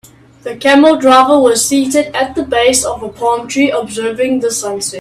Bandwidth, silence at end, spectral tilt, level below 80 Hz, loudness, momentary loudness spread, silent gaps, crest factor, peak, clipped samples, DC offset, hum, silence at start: 15 kHz; 0 s; -2.5 dB/octave; -46 dBFS; -11 LUFS; 11 LU; none; 12 dB; 0 dBFS; under 0.1%; under 0.1%; none; 0.45 s